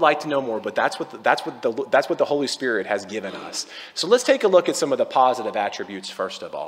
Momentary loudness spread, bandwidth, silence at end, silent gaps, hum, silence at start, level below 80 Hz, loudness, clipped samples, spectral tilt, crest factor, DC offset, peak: 12 LU; 16 kHz; 0 s; none; none; 0 s; -76 dBFS; -22 LUFS; under 0.1%; -3 dB/octave; 20 dB; under 0.1%; -2 dBFS